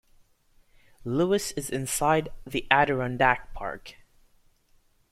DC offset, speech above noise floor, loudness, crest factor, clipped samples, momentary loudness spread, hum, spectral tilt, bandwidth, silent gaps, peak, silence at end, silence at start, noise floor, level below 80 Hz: under 0.1%; 37 dB; -26 LUFS; 26 dB; under 0.1%; 14 LU; none; -4 dB/octave; 16.5 kHz; none; -2 dBFS; 1.2 s; 1.05 s; -63 dBFS; -50 dBFS